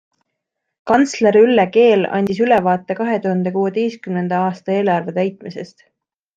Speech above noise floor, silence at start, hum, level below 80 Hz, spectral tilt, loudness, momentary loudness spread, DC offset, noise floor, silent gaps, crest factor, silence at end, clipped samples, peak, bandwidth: 61 dB; 0.85 s; none; -60 dBFS; -6.5 dB/octave; -16 LUFS; 11 LU; under 0.1%; -77 dBFS; none; 16 dB; 0.7 s; under 0.1%; -2 dBFS; 8.4 kHz